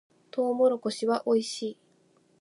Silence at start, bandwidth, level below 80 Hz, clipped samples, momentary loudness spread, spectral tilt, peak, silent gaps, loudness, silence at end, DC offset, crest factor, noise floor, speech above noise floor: 0.35 s; 11.5 kHz; -86 dBFS; under 0.1%; 12 LU; -4.5 dB/octave; -14 dBFS; none; -28 LUFS; 0.7 s; under 0.1%; 16 dB; -65 dBFS; 38 dB